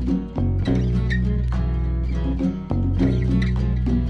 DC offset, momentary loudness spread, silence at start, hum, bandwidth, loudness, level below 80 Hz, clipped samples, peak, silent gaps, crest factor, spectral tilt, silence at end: under 0.1%; 4 LU; 0 s; none; 6.4 kHz; -22 LUFS; -24 dBFS; under 0.1%; -8 dBFS; none; 12 dB; -9 dB/octave; 0 s